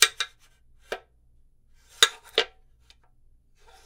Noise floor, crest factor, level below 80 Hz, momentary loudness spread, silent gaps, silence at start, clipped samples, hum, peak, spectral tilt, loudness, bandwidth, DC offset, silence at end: -59 dBFS; 30 dB; -60 dBFS; 18 LU; none; 0 s; under 0.1%; none; 0 dBFS; 2 dB/octave; -25 LUFS; 16 kHz; under 0.1%; 1.4 s